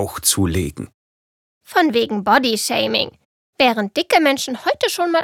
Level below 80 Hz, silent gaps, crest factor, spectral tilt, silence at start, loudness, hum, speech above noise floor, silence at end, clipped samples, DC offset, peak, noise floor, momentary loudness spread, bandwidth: -48 dBFS; 0.94-1.61 s, 3.25-3.53 s; 18 dB; -3 dB/octave; 0 s; -18 LUFS; none; over 72 dB; 0 s; under 0.1%; under 0.1%; -2 dBFS; under -90 dBFS; 8 LU; 18.5 kHz